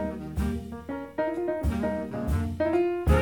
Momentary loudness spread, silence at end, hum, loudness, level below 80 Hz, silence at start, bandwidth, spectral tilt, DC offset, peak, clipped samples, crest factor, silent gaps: 10 LU; 0 s; none; -29 LUFS; -34 dBFS; 0 s; 18.5 kHz; -8 dB/octave; 0.1%; -10 dBFS; under 0.1%; 18 dB; none